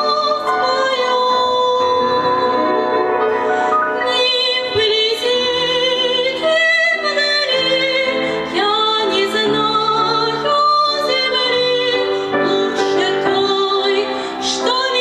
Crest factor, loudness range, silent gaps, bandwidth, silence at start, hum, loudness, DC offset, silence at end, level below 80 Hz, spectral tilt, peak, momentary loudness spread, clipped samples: 14 dB; 1 LU; none; 13 kHz; 0 s; none; -15 LUFS; under 0.1%; 0 s; -56 dBFS; -2.5 dB/octave; -2 dBFS; 3 LU; under 0.1%